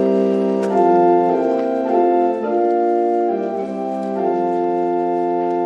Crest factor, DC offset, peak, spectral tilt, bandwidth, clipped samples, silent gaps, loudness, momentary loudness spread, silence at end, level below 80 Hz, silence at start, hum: 14 dB; under 0.1%; -4 dBFS; -8.5 dB/octave; 7.4 kHz; under 0.1%; none; -18 LUFS; 7 LU; 0 s; -64 dBFS; 0 s; none